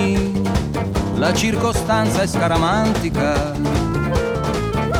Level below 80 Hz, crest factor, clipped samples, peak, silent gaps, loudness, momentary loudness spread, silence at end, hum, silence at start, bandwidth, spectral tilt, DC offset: -30 dBFS; 12 dB; under 0.1%; -6 dBFS; none; -19 LUFS; 4 LU; 0 s; none; 0 s; 18.5 kHz; -5.5 dB/octave; under 0.1%